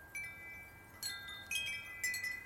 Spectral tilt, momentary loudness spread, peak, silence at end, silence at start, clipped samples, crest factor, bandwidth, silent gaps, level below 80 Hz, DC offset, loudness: 0 dB/octave; 12 LU; -24 dBFS; 0 s; 0 s; under 0.1%; 20 dB; 17 kHz; none; -68 dBFS; under 0.1%; -41 LUFS